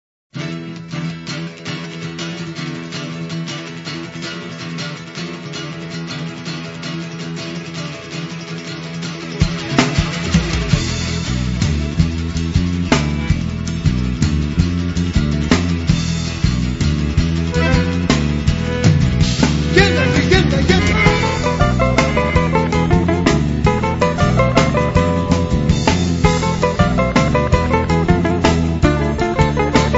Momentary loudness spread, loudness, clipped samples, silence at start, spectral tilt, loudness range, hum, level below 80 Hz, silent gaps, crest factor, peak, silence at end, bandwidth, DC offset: 13 LU; -17 LUFS; under 0.1%; 0.35 s; -6 dB/octave; 12 LU; none; -26 dBFS; none; 16 dB; 0 dBFS; 0 s; 8 kHz; under 0.1%